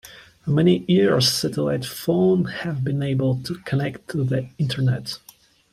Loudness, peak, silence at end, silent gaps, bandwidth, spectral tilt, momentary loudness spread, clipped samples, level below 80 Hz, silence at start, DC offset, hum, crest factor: -22 LUFS; -6 dBFS; 0.55 s; none; 15.5 kHz; -6 dB/octave; 10 LU; under 0.1%; -56 dBFS; 0.05 s; under 0.1%; none; 16 dB